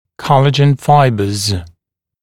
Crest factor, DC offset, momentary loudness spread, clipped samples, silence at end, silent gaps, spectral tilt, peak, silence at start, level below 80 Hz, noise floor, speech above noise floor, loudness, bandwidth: 14 dB; under 0.1%; 8 LU; under 0.1%; 0.55 s; none; -6 dB/octave; 0 dBFS; 0.2 s; -42 dBFS; -66 dBFS; 54 dB; -12 LUFS; 14.5 kHz